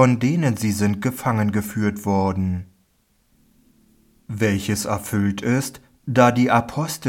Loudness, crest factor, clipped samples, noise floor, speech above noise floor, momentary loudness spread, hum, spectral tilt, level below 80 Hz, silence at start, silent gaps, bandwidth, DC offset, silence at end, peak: -21 LUFS; 18 dB; under 0.1%; -63 dBFS; 44 dB; 9 LU; none; -6 dB/octave; -54 dBFS; 0 s; none; 17.5 kHz; under 0.1%; 0 s; -2 dBFS